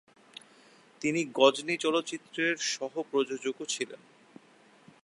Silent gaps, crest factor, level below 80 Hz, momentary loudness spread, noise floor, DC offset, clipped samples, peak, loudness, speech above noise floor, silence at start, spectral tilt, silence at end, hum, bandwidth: none; 24 dB; -82 dBFS; 25 LU; -60 dBFS; under 0.1%; under 0.1%; -8 dBFS; -30 LUFS; 30 dB; 1 s; -3 dB/octave; 1.1 s; none; 11.5 kHz